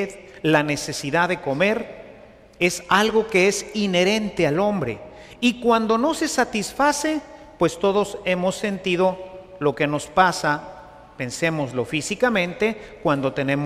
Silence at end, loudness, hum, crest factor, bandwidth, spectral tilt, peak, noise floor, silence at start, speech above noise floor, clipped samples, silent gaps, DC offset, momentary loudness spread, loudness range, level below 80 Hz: 0 s; -21 LUFS; none; 18 dB; 15.5 kHz; -4.5 dB/octave; -4 dBFS; -46 dBFS; 0 s; 25 dB; under 0.1%; none; under 0.1%; 9 LU; 2 LU; -52 dBFS